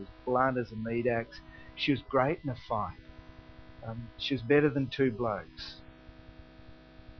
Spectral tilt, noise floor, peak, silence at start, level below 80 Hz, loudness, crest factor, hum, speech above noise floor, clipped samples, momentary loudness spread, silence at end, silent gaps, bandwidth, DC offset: -4.5 dB/octave; -53 dBFS; -12 dBFS; 0 s; -54 dBFS; -31 LUFS; 22 dB; none; 22 dB; under 0.1%; 21 LU; 0.05 s; none; 6.4 kHz; under 0.1%